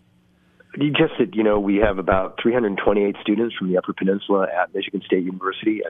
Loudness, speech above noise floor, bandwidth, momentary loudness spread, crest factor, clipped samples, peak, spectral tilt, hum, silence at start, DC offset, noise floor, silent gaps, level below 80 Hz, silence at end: -21 LUFS; 38 dB; 3.9 kHz; 5 LU; 18 dB; under 0.1%; -2 dBFS; -9.5 dB/octave; none; 0.75 s; under 0.1%; -58 dBFS; none; -42 dBFS; 0 s